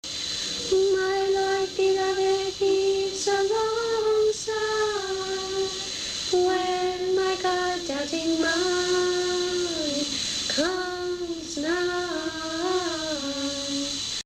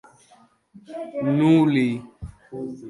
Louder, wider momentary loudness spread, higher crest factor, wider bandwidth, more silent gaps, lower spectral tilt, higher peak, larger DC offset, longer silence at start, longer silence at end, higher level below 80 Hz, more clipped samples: second, -25 LUFS vs -20 LUFS; second, 5 LU vs 23 LU; about the same, 14 dB vs 18 dB; first, 14 kHz vs 11.5 kHz; neither; second, -2 dB/octave vs -8 dB/octave; second, -12 dBFS vs -6 dBFS; neither; second, 0.05 s vs 0.75 s; about the same, 0.05 s vs 0 s; about the same, -54 dBFS vs -52 dBFS; neither